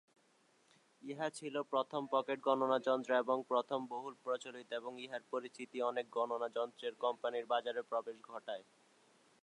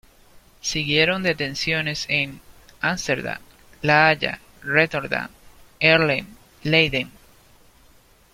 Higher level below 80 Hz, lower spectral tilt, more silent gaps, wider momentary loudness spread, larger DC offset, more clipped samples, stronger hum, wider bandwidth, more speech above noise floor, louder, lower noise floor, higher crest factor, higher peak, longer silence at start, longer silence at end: second, under -90 dBFS vs -50 dBFS; about the same, -4.5 dB/octave vs -4 dB/octave; neither; about the same, 12 LU vs 13 LU; neither; neither; neither; second, 11 kHz vs 16 kHz; about the same, 34 dB vs 33 dB; second, -39 LUFS vs -21 LUFS; first, -73 dBFS vs -54 dBFS; about the same, 20 dB vs 22 dB; second, -20 dBFS vs -2 dBFS; first, 1.05 s vs 0.35 s; second, 0.8 s vs 1.25 s